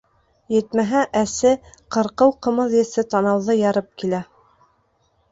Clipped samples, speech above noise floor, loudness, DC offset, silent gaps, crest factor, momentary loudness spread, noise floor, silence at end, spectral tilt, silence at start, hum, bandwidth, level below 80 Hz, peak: under 0.1%; 45 dB; -20 LUFS; under 0.1%; none; 18 dB; 8 LU; -64 dBFS; 1.1 s; -5.5 dB/octave; 0.5 s; none; 8 kHz; -56 dBFS; -2 dBFS